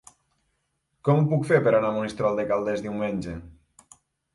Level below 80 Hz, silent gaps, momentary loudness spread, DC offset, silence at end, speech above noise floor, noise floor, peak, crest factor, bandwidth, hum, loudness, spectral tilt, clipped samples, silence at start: -54 dBFS; none; 10 LU; under 0.1%; 0.85 s; 51 dB; -75 dBFS; -6 dBFS; 20 dB; 11.5 kHz; none; -24 LUFS; -8 dB/octave; under 0.1%; 1.05 s